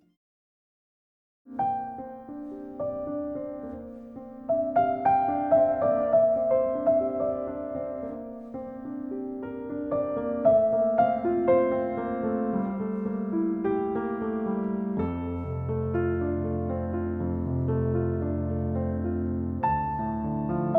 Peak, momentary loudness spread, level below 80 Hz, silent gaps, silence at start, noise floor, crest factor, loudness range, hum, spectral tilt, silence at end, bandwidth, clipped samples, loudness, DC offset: -10 dBFS; 15 LU; -48 dBFS; none; 1.45 s; under -90 dBFS; 18 dB; 9 LU; none; -12 dB/octave; 0 s; 3.8 kHz; under 0.1%; -27 LUFS; under 0.1%